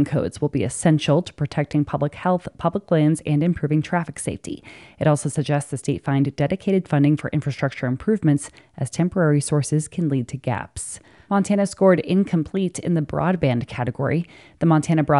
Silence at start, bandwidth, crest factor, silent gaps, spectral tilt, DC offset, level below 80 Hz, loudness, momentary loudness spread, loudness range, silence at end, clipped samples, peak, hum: 0 s; 11.5 kHz; 18 dB; none; -6.5 dB/octave; under 0.1%; -52 dBFS; -22 LUFS; 9 LU; 2 LU; 0 s; under 0.1%; -4 dBFS; none